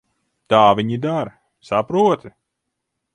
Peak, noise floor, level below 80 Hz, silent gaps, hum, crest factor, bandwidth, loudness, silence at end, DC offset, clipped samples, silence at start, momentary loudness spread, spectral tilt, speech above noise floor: 0 dBFS; -78 dBFS; -58 dBFS; none; none; 20 dB; 10.5 kHz; -18 LUFS; 0.85 s; under 0.1%; under 0.1%; 0.5 s; 11 LU; -6.5 dB/octave; 61 dB